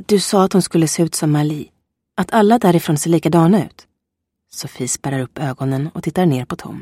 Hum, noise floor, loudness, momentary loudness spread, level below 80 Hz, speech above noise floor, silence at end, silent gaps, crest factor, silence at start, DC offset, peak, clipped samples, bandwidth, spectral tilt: none; -77 dBFS; -16 LUFS; 15 LU; -54 dBFS; 61 dB; 0 s; none; 16 dB; 0 s; under 0.1%; 0 dBFS; under 0.1%; 16 kHz; -5.5 dB/octave